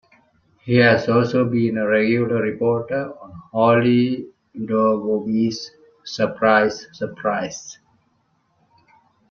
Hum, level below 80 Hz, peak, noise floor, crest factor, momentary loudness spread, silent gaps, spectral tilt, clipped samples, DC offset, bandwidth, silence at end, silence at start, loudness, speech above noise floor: none; -60 dBFS; -2 dBFS; -65 dBFS; 18 dB; 17 LU; none; -6.5 dB/octave; under 0.1%; under 0.1%; 7 kHz; 1.55 s; 0.65 s; -19 LUFS; 46 dB